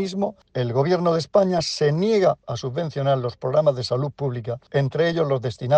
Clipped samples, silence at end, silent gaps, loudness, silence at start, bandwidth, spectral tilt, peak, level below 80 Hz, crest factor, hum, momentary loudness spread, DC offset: under 0.1%; 0 s; none; -22 LUFS; 0 s; 9.2 kHz; -6.5 dB/octave; -4 dBFS; -58 dBFS; 16 dB; none; 8 LU; under 0.1%